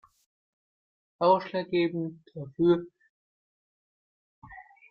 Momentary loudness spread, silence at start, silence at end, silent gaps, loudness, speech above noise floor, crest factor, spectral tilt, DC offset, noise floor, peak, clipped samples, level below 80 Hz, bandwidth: 18 LU; 1.2 s; 0.3 s; 3.10-4.42 s; -27 LUFS; over 63 dB; 22 dB; -9 dB/octave; under 0.1%; under -90 dBFS; -10 dBFS; under 0.1%; -70 dBFS; 5.6 kHz